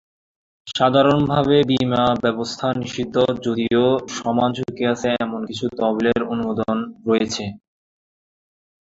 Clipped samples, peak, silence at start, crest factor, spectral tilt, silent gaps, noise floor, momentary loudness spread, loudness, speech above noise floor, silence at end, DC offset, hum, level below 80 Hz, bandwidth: under 0.1%; -2 dBFS; 0.65 s; 18 dB; -6 dB/octave; none; under -90 dBFS; 8 LU; -20 LUFS; over 71 dB; 1.25 s; under 0.1%; none; -52 dBFS; 7.8 kHz